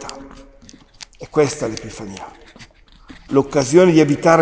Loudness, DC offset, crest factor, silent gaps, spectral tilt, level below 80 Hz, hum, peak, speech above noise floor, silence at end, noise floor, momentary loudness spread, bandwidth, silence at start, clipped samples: -16 LUFS; under 0.1%; 18 dB; none; -5.5 dB/octave; -48 dBFS; none; 0 dBFS; 30 dB; 0 s; -45 dBFS; 25 LU; 8 kHz; 0 s; under 0.1%